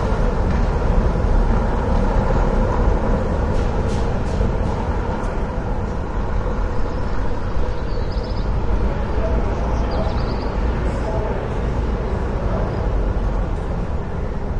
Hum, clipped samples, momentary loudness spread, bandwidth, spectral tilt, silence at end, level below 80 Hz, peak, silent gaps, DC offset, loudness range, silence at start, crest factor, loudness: none; under 0.1%; 5 LU; 8.2 kHz; -8 dB/octave; 0 s; -22 dBFS; -4 dBFS; none; under 0.1%; 4 LU; 0 s; 14 dB; -22 LUFS